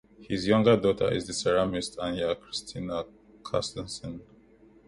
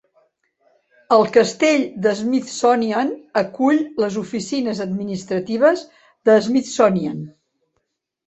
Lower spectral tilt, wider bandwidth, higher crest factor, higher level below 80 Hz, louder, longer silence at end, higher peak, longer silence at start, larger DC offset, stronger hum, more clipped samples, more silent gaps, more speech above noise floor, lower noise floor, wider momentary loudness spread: about the same, -5 dB/octave vs -5 dB/octave; first, 11.5 kHz vs 8.2 kHz; about the same, 20 dB vs 18 dB; first, -54 dBFS vs -62 dBFS; second, -28 LUFS vs -19 LUFS; second, 0.65 s vs 0.95 s; second, -10 dBFS vs -2 dBFS; second, 0.2 s vs 1.1 s; neither; neither; neither; neither; second, 29 dB vs 55 dB; second, -57 dBFS vs -73 dBFS; first, 16 LU vs 9 LU